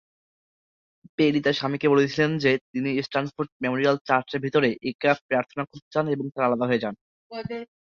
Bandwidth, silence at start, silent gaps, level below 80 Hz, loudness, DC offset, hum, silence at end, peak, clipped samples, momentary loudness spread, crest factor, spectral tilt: 7.2 kHz; 1.2 s; 2.61-2.73 s, 3.52-3.60 s, 4.01-4.05 s, 4.95-4.99 s, 5.21-5.29 s, 5.82-5.91 s, 7.01-7.30 s; -64 dBFS; -24 LUFS; under 0.1%; none; 0.2 s; -4 dBFS; under 0.1%; 12 LU; 20 dB; -6.5 dB/octave